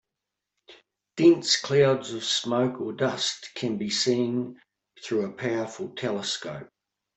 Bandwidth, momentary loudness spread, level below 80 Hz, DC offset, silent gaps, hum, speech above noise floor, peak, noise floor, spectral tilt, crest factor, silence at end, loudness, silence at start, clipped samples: 8.4 kHz; 13 LU; -70 dBFS; under 0.1%; none; none; 60 dB; -8 dBFS; -86 dBFS; -4 dB/octave; 20 dB; 0.5 s; -25 LUFS; 0.7 s; under 0.1%